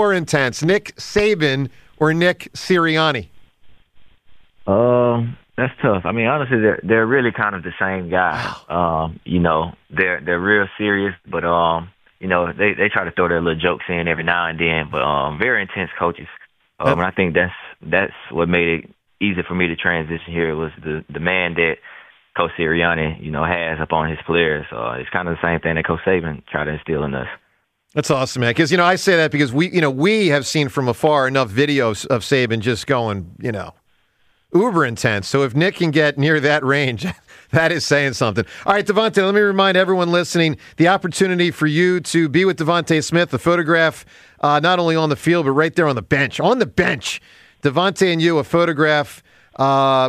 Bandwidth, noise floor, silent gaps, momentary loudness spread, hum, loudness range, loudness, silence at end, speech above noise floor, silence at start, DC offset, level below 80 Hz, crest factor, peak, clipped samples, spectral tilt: 15 kHz; -63 dBFS; none; 8 LU; none; 4 LU; -18 LUFS; 0 s; 46 dB; 0 s; under 0.1%; -46 dBFS; 16 dB; -2 dBFS; under 0.1%; -5.5 dB/octave